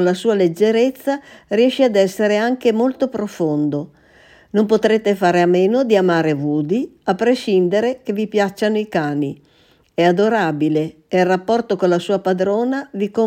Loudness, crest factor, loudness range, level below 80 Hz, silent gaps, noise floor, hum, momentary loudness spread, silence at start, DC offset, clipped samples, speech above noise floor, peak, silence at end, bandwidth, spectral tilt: -17 LUFS; 16 dB; 2 LU; -62 dBFS; none; -48 dBFS; none; 8 LU; 0 s; under 0.1%; under 0.1%; 32 dB; -2 dBFS; 0 s; 16.5 kHz; -6.5 dB/octave